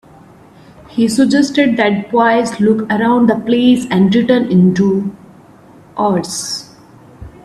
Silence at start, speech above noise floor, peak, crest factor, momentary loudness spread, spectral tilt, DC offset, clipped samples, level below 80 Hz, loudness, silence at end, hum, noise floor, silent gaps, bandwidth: 0.9 s; 29 dB; 0 dBFS; 14 dB; 9 LU; -5.5 dB/octave; under 0.1%; under 0.1%; -50 dBFS; -13 LUFS; 0.15 s; none; -41 dBFS; none; 13 kHz